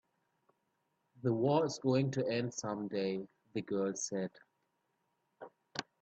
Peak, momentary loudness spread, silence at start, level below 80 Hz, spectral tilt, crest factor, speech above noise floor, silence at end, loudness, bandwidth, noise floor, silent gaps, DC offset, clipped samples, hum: -18 dBFS; 13 LU; 1.25 s; -78 dBFS; -5.5 dB/octave; 20 dB; 47 dB; 0.2 s; -36 LUFS; 8.6 kHz; -81 dBFS; none; under 0.1%; under 0.1%; none